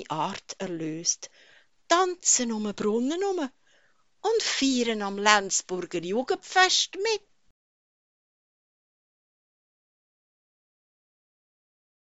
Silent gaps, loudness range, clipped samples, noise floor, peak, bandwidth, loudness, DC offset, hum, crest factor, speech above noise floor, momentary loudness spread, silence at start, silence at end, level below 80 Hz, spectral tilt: none; 4 LU; under 0.1%; -67 dBFS; -2 dBFS; 8.2 kHz; -25 LUFS; 0.1%; none; 28 dB; 40 dB; 12 LU; 0 s; 4.95 s; -70 dBFS; -1.5 dB/octave